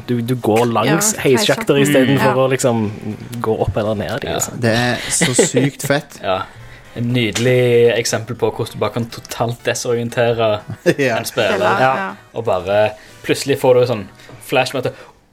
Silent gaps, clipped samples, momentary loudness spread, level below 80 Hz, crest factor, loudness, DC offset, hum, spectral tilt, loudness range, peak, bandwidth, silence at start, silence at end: none; under 0.1%; 10 LU; -46 dBFS; 16 dB; -16 LUFS; under 0.1%; none; -4.5 dB/octave; 3 LU; 0 dBFS; 17 kHz; 0 s; 0.3 s